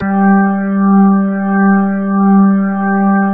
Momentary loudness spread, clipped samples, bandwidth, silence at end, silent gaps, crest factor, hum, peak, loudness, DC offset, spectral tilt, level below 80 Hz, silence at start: 4 LU; under 0.1%; 2.5 kHz; 0 s; none; 10 dB; none; 0 dBFS; -11 LUFS; under 0.1%; -14.5 dB/octave; -50 dBFS; 0 s